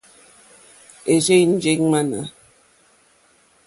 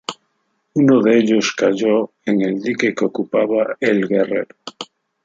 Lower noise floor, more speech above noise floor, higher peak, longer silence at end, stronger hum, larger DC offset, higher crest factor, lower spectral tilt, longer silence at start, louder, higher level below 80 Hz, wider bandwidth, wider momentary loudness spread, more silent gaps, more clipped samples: second, -57 dBFS vs -68 dBFS; second, 40 dB vs 52 dB; about the same, -4 dBFS vs -2 dBFS; first, 1.35 s vs 0.4 s; neither; neither; about the same, 18 dB vs 16 dB; about the same, -4.5 dB/octave vs -5.5 dB/octave; first, 1.05 s vs 0.1 s; about the same, -18 LUFS vs -17 LUFS; about the same, -62 dBFS vs -64 dBFS; first, 11.5 kHz vs 7.8 kHz; about the same, 15 LU vs 17 LU; neither; neither